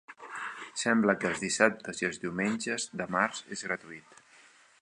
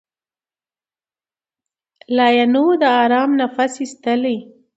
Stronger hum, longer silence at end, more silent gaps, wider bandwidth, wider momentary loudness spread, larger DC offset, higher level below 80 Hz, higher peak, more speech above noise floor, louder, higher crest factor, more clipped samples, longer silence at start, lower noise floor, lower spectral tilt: neither; first, 0.7 s vs 0.35 s; neither; first, 11 kHz vs 8.2 kHz; first, 13 LU vs 9 LU; neither; about the same, -70 dBFS vs -74 dBFS; second, -6 dBFS vs 0 dBFS; second, 29 dB vs over 74 dB; second, -30 LUFS vs -16 LUFS; first, 26 dB vs 18 dB; neither; second, 0.1 s vs 2.1 s; second, -59 dBFS vs under -90 dBFS; about the same, -3.5 dB/octave vs -4 dB/octave